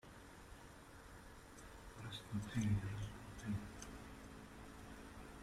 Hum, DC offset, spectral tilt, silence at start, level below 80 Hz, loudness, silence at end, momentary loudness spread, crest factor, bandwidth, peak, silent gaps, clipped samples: none; under 0.1%; -6 dB/octave; 0.05 s; -60 dBFS; -48 LUFS; 0 s; 17 LU; 20 dB; 15 kHz; -28 dBFS; none; under 0.1%